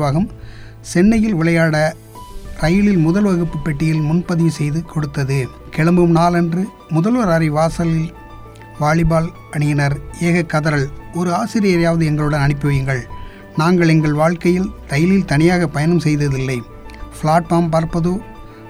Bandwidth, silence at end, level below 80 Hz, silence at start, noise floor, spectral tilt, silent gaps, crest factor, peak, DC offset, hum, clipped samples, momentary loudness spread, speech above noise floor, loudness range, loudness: 14 kHz; 0 s; -34 dBFS; 0 s; -36 dBFS; -7 dB/octave; none; 16 dB; 0 dBFS; under 0.1%; none; under 0.1%; 11 LU; 20 dB; 2 LU; -16 LUFS